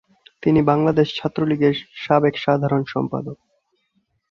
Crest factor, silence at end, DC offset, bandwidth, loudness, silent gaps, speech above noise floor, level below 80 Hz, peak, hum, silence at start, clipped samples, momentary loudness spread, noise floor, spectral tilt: 18 dB; 1 s; under 0.1%; 6.8 kHz; -20 LUFS; none; 50 dB; -54 dBFS; -2 dBFS; none; 0.45 s; under 0.1%; 9 LU; -68 dBFS; -8.5 dB/octave